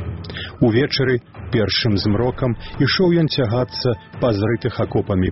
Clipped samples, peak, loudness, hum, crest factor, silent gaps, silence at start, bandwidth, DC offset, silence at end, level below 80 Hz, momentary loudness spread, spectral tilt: under 0.1%; -2 dBFS; -19 LUFS; none; 16 dB; none; 0 s; 6 kHz; 0.3%; 0 s; -40 dBFS; 7 LU; -5 dB/octave